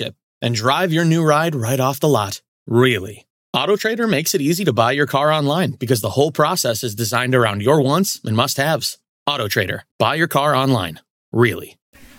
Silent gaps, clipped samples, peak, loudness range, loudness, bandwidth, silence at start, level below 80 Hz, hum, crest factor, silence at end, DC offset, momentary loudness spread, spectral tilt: 0.23-0.41 s, 2.48-2.66 s, 3.30-3.53 s, 9.09-9.26 s, 9.91-9.99 s, 11.10-11.32 s, 11.82-11.93 s; under 0.1%; -2 dBFS; 2 LU; -18 LUFS; 17 kHz; 0 s; -60 dBFS; none; 16 dB; 0.15 s; under 0.1%; 8 LU; -4.5 dB/octave